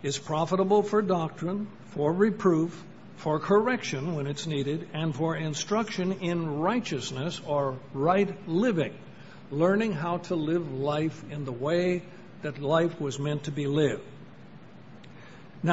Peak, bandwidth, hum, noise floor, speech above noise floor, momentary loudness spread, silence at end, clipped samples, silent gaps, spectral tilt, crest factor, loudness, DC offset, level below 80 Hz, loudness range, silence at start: -8 dBFS; 8 kHz; none; -49 dBFS; 21 dB; 14 LU; 0 s; under 0.1%; none; -6 dB/octave; 20 dB; -28 LUFS; 0.3%; -62 dBFS; 2 LU; 0 s